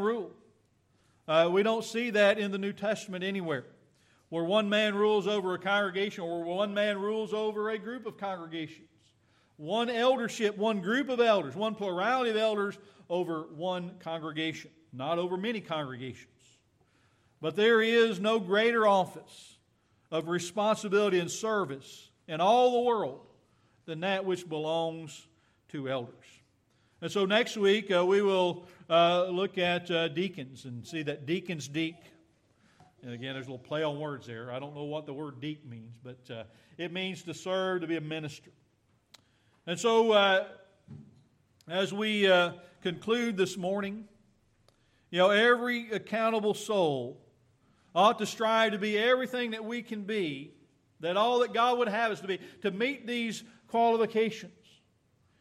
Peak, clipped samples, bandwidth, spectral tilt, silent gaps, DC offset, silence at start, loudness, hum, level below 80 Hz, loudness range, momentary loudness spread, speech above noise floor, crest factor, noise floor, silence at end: -10 dBFS; under 0.1%; 14 kHz; -4.5 dB/octave; none; under 0.1%; 0 s; -29 LUFS; none; -78 dBFS; 9 LU; 17 LU; 40 dB; 20 dB; -70 dBFS; 0.9 s